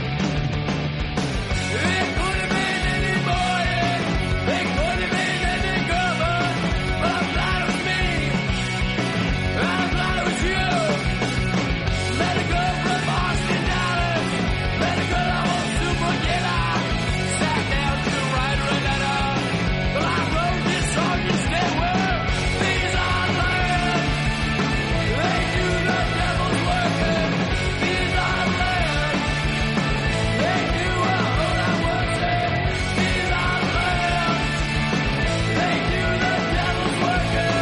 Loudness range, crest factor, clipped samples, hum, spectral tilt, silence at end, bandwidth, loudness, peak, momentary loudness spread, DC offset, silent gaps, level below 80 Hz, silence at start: 1 LU; 12 dB; under 0.1%; none; -5 dB/octave; 0 s; 11.5 kHz; -21 LUFS; -8 dBFS; 2 LU; under 0.1%; none; -30 dBFS; 0 s